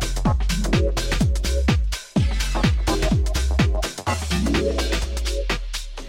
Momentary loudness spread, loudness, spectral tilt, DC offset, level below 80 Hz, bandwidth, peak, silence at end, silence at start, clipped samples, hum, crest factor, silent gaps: 5 LU; -23 LUFS; -5 dB/octave; under 0.1%; -24 dBFS; 16.5 kHz; -6 dBFS; 0 s; 0 s; under 0.1%; none; 16 dB; none